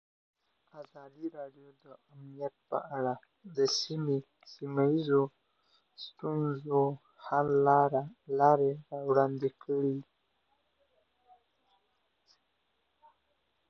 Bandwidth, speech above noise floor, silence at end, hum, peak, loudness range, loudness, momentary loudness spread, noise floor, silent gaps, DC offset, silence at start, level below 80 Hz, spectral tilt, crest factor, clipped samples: 7 kHz; 47 dB; 3.65 s; none; -12 dBFS; 12 LU; -31 LUFS; 21 LU; -78 dBFS; none; under 0.1%; 0.75 s; -76 dBFS; -6 dB/octave; 22 dB; under 0.1%